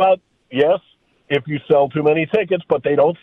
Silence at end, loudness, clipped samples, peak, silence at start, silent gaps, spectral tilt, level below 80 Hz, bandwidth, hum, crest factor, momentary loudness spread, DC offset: 0.05 s; -18 LUFS; under 0.1%; -4 dBFS; 0 s; none; -8.5 dB/octave; -58 dBFS; 4.1 kHz; none; 14 dB; 7 LU; under 0.1%